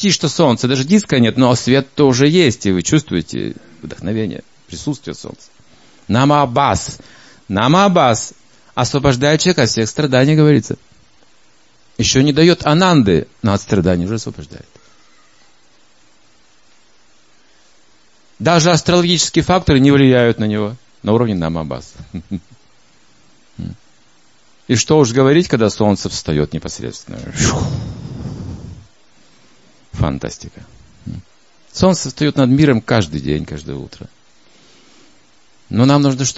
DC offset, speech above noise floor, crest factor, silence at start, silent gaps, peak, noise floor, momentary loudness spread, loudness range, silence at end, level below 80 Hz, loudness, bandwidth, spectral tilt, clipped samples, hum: 0.4%; 40 dB; 16 dB; 0 s; none; 0 dBFS; -54 dBFS; 20 LU; 10 LU; 0.05 s; -40 dBFS; -14 LUFS; 8 kHz; -5 dB/octave; under 0.1%; none